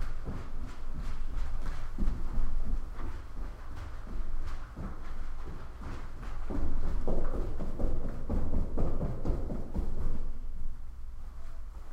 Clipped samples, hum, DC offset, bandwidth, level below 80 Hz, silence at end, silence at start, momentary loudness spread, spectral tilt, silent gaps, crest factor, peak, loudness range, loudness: under 0.1%; none; under 0.1%; 2.8 kHz; -32 dBFS; 0 s; 0 s; 10 LU; -8 dB/octave; none; 14 dB; -16 dBFS; 7 LU; -40 LUFS